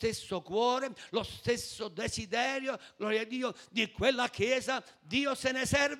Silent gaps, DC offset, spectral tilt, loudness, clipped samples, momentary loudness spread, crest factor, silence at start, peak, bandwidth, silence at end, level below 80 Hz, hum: none; under 0.1%; -3.5 dB/octave; -32 LUFS; under 0.1%; 7 LU; 20 dB; 0 s; -14 dBFS; 16 kHz; 0 s; -60 dBFS; none